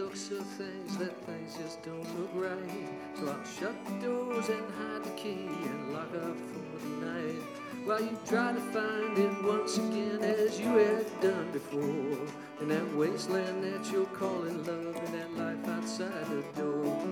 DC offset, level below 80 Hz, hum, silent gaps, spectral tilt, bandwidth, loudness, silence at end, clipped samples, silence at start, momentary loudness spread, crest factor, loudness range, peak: under 0.1%; -78 dBFS; none; none; -5 dB/octave; 18.5 kHz; -34 LUFS; 0 s; under 0.1%; 0 s; 10 LU; 20 dB; 8 LU; -14 dBFS